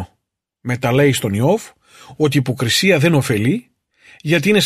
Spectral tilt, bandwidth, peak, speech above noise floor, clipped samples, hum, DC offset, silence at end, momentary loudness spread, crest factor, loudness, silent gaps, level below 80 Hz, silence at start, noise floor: -5 dB/octave; 15 kHz; -2 dBFS; 57 dB; under 0.1%; none; under 0.1%; 0 s; 12 LU; 16 dB; -16 LUFS; none; -52 dBFS; 0 s; -73 dBFS